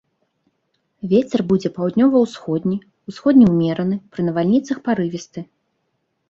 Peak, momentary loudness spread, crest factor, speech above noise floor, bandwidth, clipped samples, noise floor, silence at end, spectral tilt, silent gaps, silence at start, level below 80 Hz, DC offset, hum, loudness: -2 dBFS; 15 LU; 16 dB; 53 dB; 7.6 kHz; under 0.1%; -71 dBFS; 0.85 s; -8 dB/octave; none; 1.05 s; -56 dBFS; under 0.1%; none; -18 LUFS